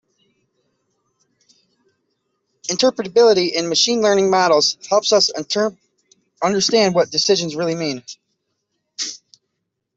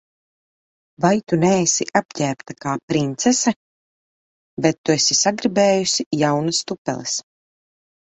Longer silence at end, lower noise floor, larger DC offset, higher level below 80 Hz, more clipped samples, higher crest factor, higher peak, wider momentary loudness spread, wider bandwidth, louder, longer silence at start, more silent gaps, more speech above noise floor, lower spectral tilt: about the same, 0.8 s vs 0.8 s; second, -76 dBFS vs under -90 dBFS; neither; second, -66 dBFS vs -60 dBFS; neither; about the same, 16 dB vs 20 dB; about the same, -2 dBFS vs -2 dBFS; first, 13 LU vs 10 LU; about the same, 8 kHz vs 8.4 kHz; about the same, -17 LUFS vs -19 LUFS; first, 2.65 s vs 1 s; second, none vs 2.05-2.09 s, 2.83-2.88 s, 3.56-4.57 s, 4.78-4.84 s, 6.06-6.11 s, 6.78-6.85 s; second, 60 dB vs over 71 dB; about the same, -3 dB/octave vs -3.5 dB/octave